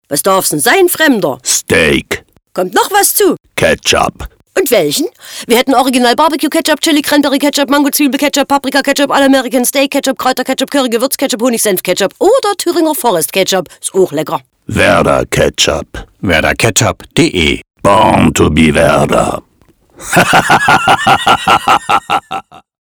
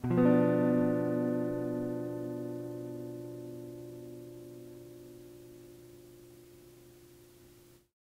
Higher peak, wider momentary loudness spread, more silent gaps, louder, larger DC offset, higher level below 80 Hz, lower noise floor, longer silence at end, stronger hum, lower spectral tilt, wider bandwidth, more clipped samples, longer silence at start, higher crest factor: first, 0 dBFS vs -14 dBFS; second, 8 LU vs 27 LU; neither; first, -10 LUFS vs -32 LUFS; neither; first, -34 dBFS vs -66 dBFS; second, -49 dBFS vs -59 dBFS; second, 0.3 s vs 0.85 s; neither; second, -3.5 dB/octave vs -9 dB/octave; first, over 20 kHz vs 16 kHz; first, 0.2% vs under 0.1%; about the same, 0.1 s vs 0 s; second, 10 dB vs 20 dB